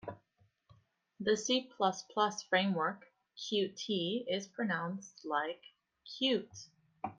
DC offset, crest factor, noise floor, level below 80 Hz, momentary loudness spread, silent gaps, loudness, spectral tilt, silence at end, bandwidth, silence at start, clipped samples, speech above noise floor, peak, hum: under 0.1%; 22 dB; -74 dBFS; -78 dBFS; 16 LU; none; -35 LUFS; -4 dB/octave; 0.05 s; 9.4 kHz; 0.05 s; under 0.1%; 38 dB; -16 dBFS; none